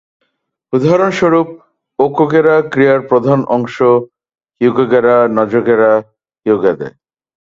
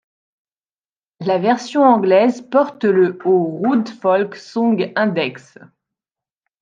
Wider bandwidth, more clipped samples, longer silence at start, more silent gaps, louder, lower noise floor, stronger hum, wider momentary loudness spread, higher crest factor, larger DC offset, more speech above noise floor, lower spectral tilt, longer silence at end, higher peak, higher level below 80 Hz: about the same, 7.6 kHz vs 7.6 kHz; neither; second, 0.7 s vs 1.2 s; neither; first, -12 LUFS vs -17 LUFS; second, -68 dBFS vs under -90 dBFS; neither; about the same, 6 LU vs 7 LU; about the same, 12 dB vs 16 dB; neither; second, 57 dB vs over 74 dB; about the same, -7.5 dB/octave vs -6.5 dB/octave; second, 0.55 s vs 1.25 s; about the same, 0 dBFS vs -2 dBFS; first, -54 dBFS vs -72 dBFS